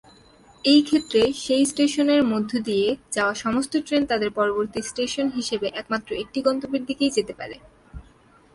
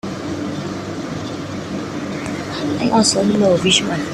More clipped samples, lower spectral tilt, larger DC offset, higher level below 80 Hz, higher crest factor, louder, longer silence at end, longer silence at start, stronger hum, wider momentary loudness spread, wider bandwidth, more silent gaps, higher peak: neither; about the same, -3.5 dB/octave vs -4 dB/octave; neither; second, -54 dBFS vs -48 dBFS; about the same, 18 dB vs 16 dB; second, -23 LUFS vs -19 LUFS; first, 0.55 s vs 0 s; first, 0.65 s vs 0.05 s; neither; second, 9 LU vs 12 LU; second, 11.5 kHz vs 13 kHz; neither; second, -6 dBFS vs -2 dBFS